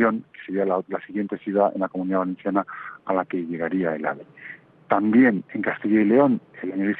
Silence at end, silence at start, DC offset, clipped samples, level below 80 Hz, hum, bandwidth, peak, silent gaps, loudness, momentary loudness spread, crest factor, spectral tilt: 0 s; 0 s; under 0.1%; under 0.1%; -68 dBFS; none; 4.4 kHz; -4 dBFS; none; -23 LUFS; 14 LU; 18 dB; -10.5 dB/octave